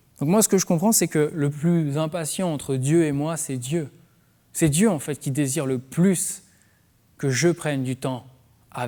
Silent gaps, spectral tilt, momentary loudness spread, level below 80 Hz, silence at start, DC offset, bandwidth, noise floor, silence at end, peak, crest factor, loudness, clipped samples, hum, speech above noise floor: none; -5 dB/octave; 10 LU; -58 dBFS; 0.2 s; under 0.1%; over 20 kHz; -60 dBFS; 0 s; -6 dBFS; 18 dB; -23 LUFS; under 0.1%; none; 38 dB